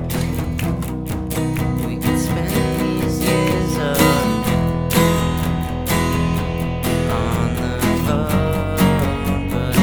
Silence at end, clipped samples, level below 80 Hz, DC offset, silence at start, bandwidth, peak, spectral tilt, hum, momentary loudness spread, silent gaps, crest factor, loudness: 0 s; under 0.1%; -30 dBFS; under 0.1%; 0 s; over 20 kHz; 0 dBFS; -5.5 dB/octave; none; 6 LU; none; 18 dB; -19 LUFS